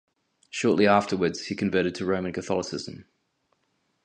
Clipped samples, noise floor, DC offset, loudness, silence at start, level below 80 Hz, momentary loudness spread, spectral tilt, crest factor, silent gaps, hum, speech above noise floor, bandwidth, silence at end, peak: under 0.1%; -73 dBFS; under 0.1%; -25 LUFS; 0.55 s; -58 dBFS; 14 LU; -5 dB/octave; 22 dB; none; none; 48 dB; 9.8 kHz; 1.05 s; -6 dBFS